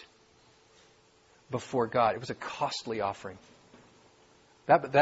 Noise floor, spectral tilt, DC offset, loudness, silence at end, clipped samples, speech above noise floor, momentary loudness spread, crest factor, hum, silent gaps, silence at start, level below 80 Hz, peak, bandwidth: -63 dBFS; -5 dB/octave; under 0.1%; -30 LUFS; 0 s; under 0.1%; 34 dB; 17 LU; 24 dB; none; none; 0 s; -70 dBFS; -8 dBFS; 8 kHz